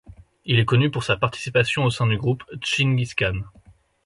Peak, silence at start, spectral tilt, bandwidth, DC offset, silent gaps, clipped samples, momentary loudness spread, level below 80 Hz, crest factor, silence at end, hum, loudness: -4 dBFS; 0.1 s; -5.5 dB/octave; 11.5 kHz; under 0.1%; none; under 0.1%; 7 LU; -46 dBFS; 20 dB; 0.55 s; none; -22 LUFS